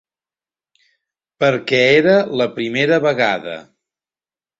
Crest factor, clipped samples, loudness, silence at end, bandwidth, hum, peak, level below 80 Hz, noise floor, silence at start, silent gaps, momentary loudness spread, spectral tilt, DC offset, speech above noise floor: 18 dB; under 0.1%; -15 LUFS; 0.95 s; 7.8 kHz; none; -2 dBFS; -60 dBFS; under -90 dBFS; 1.4 s; none; 10 LU; -5.5 dB/octave; under 0.1%; over 75 dB